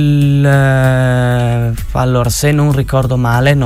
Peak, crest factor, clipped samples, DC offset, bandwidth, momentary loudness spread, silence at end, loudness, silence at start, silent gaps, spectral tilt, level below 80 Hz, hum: 0 dBFS; 10 dB; under 0.1%; under 0.1%; 15.5 kHz; 5 LU; 0 s; -12 LUFS; 0 s; none; -6.5 dB/octave; -26 dBFS; none